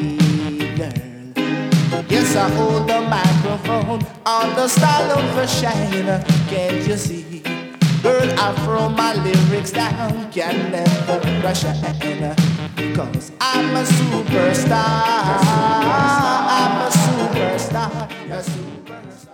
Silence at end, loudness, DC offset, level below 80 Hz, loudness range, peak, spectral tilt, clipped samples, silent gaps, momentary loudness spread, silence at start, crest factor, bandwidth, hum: 0.15 s; -18 LUFS; under 0.1%; -46 dBFS; 3 LU; 0 dBFS; -5.5 dB/octave; under 0.1%; none; 10 LU; 0 s; 16 dB; 18 kHz; none